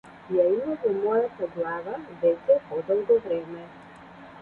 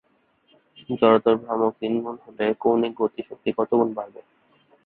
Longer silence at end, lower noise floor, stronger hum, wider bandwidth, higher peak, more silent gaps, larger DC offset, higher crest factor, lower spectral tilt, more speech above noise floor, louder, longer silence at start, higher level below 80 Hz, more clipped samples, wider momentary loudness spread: second, 0 s vs 0.75 s; second, -46 dBFS vs -64 dBFS; neither; about the same, 4.4 kHz vs 4.3 kHz; second, -10 dBFS vs -4 dBFS; neither; neither; about the same, 16 dB vs 20 dB; second, -8.5 dB/octave vs -10.5 dB/octave; second, 21 dB vs 42 dB; second, -26 LUFS vs -23 LUFS; second, 0.05 s vs 0.9 s; about the same, -66 dBFS vs -66 dBFS; neither; first, 17 LU vs 13 LU